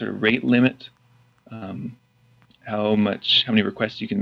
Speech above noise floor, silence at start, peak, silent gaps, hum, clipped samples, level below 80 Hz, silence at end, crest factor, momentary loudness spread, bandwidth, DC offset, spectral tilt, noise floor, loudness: 36 dB; 0 s; -4 dBFS; none; none; under 0.1%; -62 dBFS; 0 s; 18 dB; 20 LU; 6.6 kHz; under 0.1%; -7 dB/octave; -58 dBFS; -20 LUFS